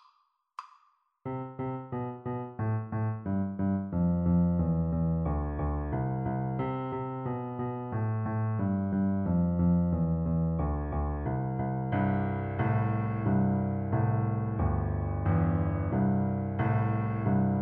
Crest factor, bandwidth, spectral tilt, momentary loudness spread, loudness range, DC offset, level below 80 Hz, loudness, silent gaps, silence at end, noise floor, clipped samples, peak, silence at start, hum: 14 dB; 3.4 kHz; -10.5 dB/octave; 8 LU; 4 LU; under 0.1%; -42 dBFS; -30 LUFS; none; 0 s; -70 dBFS; under 0.1%; -16 dBFS; 0.6 s; none